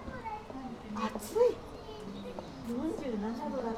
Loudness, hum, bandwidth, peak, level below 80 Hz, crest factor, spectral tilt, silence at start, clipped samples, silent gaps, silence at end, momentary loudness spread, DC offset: -36 LUFS; none; 16 kHz; -16 dBFS; -56 dBFS; 20 dB; -6 dB/octave; 0 s; under 0.1%; none; 0 s; 14 LU; under 0.1%